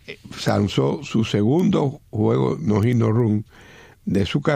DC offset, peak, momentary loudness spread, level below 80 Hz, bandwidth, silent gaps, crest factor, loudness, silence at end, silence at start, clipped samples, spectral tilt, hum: under 0.1%; -4 dBFS; 8 LU; -50 dBFS; 14.5 kHz; none; 18 dB; -21 LUFS; 0 s; 0.1 s; under 0.1%; -7.5 dB/octave; none